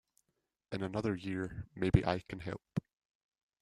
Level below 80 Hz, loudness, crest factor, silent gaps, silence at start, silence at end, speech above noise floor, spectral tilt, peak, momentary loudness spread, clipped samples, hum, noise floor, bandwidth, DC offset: -52 dBFS; -37 LUFS; 24 dB; none; 0.7 s; 0.8 s; 50 dB; -8 dB/octave; -12 dBFS; 12 LU; under 0.1%; none; -85 dBFS; 11 kHz; under 0.1%